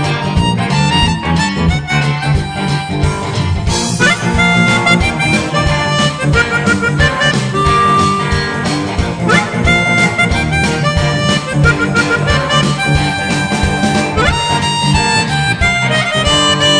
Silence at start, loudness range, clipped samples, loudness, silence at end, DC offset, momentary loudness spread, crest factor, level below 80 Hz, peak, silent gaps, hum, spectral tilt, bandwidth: 0 s; 2 LU; under 0.1%; -12 LUFS; 0 s; under 0.1%; 5 LU; 12 dB; -26 dBFS; 0 dBFS; none; none; -4.5 dB/octave; 10 kHz